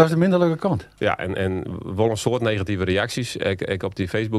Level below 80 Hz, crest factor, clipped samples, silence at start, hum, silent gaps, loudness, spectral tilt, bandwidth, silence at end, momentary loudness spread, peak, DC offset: -50 dBFS; 20 dB; under 0.1%; 0 s; none; none; -23 LUFS; -6 dB/octave; 13.5 kHz; 0 s; 7 LU; -2 dBFS; under 0.1%